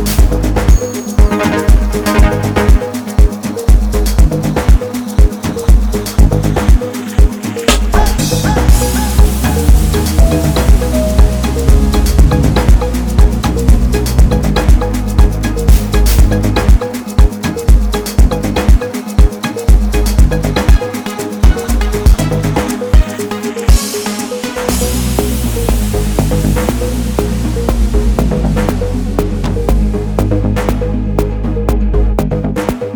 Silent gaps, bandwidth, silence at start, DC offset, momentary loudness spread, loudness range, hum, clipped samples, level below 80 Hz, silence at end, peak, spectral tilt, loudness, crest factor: none; over 20 kHz; 0 s; under 0.1%; 5 LU; 3 LU; none; 0.8%; -12 dBFS; 0 s; 0 dBFS; -6 dB/octave; -13 LUFS; 10 dB